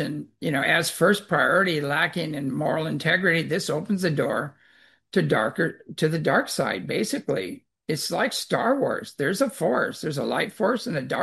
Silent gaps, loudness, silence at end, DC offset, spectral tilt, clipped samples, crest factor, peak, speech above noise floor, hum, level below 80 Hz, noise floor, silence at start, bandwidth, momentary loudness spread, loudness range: none; -24 LUFS; 0 s; under 0.1%; -4.5 dB/octave; under 0.1%; 18 dB; -6 dBFS; 34 dB; none; -68 dBFS; -58 dBFS; 0 s; 12.5 kHz; 8 LU; 3 LU